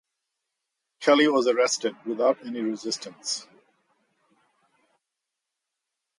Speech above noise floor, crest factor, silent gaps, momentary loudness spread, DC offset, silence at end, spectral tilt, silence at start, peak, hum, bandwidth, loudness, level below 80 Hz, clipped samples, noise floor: 61 dB; 20 dB; none; 12 LU; under 0.1%; 2.75 s; -2.5 dB/octave; 1 s; -8 dBFS; none; 11.5 kHz; -25 LUFS; -82 dBFS; under 0.1%; -85 dBFS